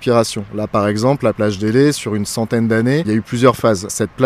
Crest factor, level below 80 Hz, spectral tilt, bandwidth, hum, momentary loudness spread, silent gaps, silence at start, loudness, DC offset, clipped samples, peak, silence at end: 16 dB; -48 dBFS; -5.5 dB/octave; 16 kHz; none; 6 LU; none; 0 s; -16 LUFS; under 0.1%; under 0.1%; 0 dBFS; 0 s